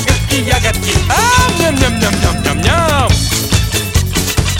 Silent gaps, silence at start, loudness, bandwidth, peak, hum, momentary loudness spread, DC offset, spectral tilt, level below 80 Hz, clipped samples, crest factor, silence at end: none; 0 s; -12 LUFS; 17 kHz; 0 dBFS; none; 4 LU; under 0.1%; -4 dB/octave; -20 dBFS; under 0.1%; 12 dB; 0 s